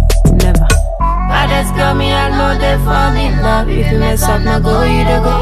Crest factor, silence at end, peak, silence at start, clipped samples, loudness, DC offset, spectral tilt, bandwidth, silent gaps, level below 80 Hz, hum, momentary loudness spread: 10 dB; 0 s; 0 dBFS; 0 s; under 0.1%; -12 LUFS; under 0.1%; -5.5 dB/octave; 14 kHz; none; -14 dBFS; none; 2 LU